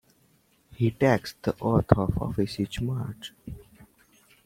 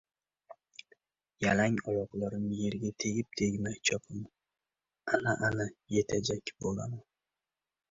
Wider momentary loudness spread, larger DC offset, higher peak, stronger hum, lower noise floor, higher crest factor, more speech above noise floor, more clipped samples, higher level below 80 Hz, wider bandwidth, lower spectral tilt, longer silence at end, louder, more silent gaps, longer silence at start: about the same, 18 LU vs 16 LU; neither; first, 0 dBFS vs -12 dBFS; neither; second, -64 dBFS vs under -90 dBFS; first, 28 dB vs 22 dB; second, 39 dB vs over 57 dB; neither; first, -46 dBFS vs -60 dBFS; first, 16 kHz vs 7.8 kHz; first, -7.5 dB/octave vs -4.5 dB/octave; second, 0.6 s vs 0.9 s; first, -27 LUFS vs -33 LUFS; neither; first, 0.7 s vs 0.5 s